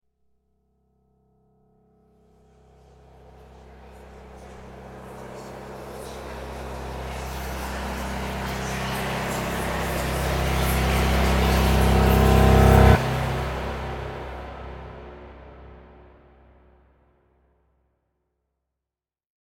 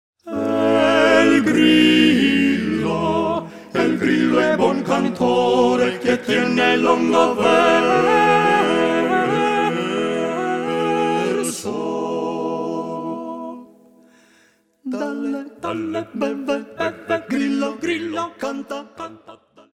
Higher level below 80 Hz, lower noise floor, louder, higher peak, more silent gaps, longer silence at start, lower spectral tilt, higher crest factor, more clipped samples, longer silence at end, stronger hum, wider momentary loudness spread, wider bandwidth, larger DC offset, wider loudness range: first, -30 dBFS vs -58 dBFS; first, -89 dBFS vs -57 dBFS; second, -23 LUFS vs -18 LUFS; about the same, -2 dBFS vs -2 dBFS; neither; first, 3.65 s vs 0.25 s; about the same, -6 dB/octave vs -5 dB/octave; first, 24 dB vs 18 dB; neither; first, 3.65 s vs 0.4 s; neither; first, 25 LU vs 13 LU; first, 17.5 kHz vs 14 kHz; neither; first, 23 LU vs 12 LU